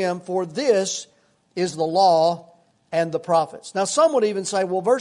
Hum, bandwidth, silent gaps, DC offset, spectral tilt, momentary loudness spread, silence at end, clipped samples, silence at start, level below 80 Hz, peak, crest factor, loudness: none; 11 kHz; none; under 0.1%; -4 dB/octave; 10 LU; 0 s; under 0.1%; 0 s; -72 dBFS; -6 dBFS; 16 dB; -21 LUFS